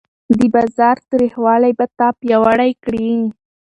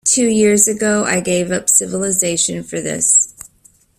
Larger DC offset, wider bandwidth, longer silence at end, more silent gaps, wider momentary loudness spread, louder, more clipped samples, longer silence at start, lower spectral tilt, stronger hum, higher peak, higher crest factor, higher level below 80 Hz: neither; second, 9.2 kHz vs 16 kHz; second, 0.3 s vs 0.55 s; neither; about the same, 6 LU vs 7 LU; about the same, -15 LUFS vs -14 LUFS; neither; first, 0.3 s vs 0.05 s; first, -7.5 dB/octave vs -3 dB/octave; neither; about the same, 0 dBFS vs 0 dBFS; about the same, 14 dB vs 16 dB; about the same, -50 dBFS vs -52 dBFS